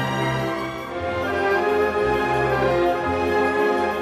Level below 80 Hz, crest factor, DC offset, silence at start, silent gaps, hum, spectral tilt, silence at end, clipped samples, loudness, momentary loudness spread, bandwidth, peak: -44 dBFS; 12 dB; under 0.1%; 0 s; none; none; -6 dB/octave; 0 s; under 0.1%; -21 LUFS; 7 LU; 15.5 kHz; -10 dBFS